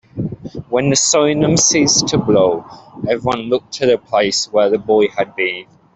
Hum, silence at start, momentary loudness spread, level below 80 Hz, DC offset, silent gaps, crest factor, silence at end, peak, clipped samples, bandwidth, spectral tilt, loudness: none; 0.15 s; 13 LU; -48 dBFS; under 0.1%; none; 14 dB; 0.35 s; -2 dBFS; under 0.1%; 8.4 kHz; -3.5 dB/octave; -15 LUFS